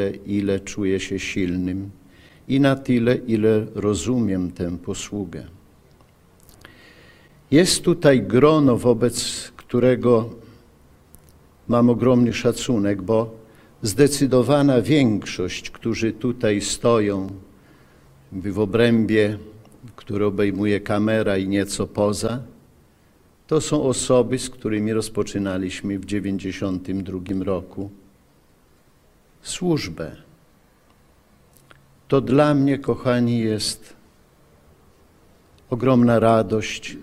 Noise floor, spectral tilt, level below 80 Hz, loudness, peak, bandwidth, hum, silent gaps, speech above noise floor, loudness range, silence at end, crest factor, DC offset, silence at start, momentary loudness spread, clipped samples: -56 dBFS; -5.5 dB/octave; -48 dBFS; -21 LUFS; -2 dBFS; 15.5 kHz; none; none; 36 dB; 10 LU; 0 s; 20 dB; under 0.1%; 0 s; 13 LU; under 0.1%